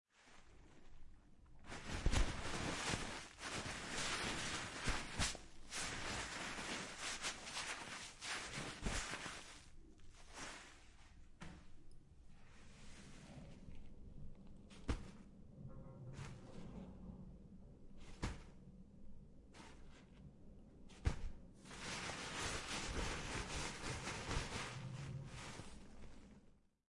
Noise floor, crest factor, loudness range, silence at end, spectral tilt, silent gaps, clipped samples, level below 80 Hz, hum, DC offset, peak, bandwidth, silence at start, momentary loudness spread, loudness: -68 dBFS; 26 dB; 15 LU; 0.35 s; -3 dB/octave; none; under 0.1%; -54 dBFS; none; under 0.1%; -22 dBFS; 11.5 kHz; 0.15 s; 22 LU; -46 LUFS